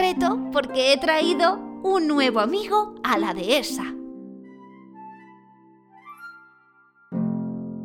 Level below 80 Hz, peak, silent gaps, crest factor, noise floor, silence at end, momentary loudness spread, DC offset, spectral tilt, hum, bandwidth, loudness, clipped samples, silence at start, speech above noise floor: -60 dBFS; -6 dBFS; none; 20 dB; -57 dBFS; 0 s; 23 LU; under 0.1%; -4 dB/octave; none; 18 kHz; -22 LUFS; under 0.1%; 0 s; 36 dB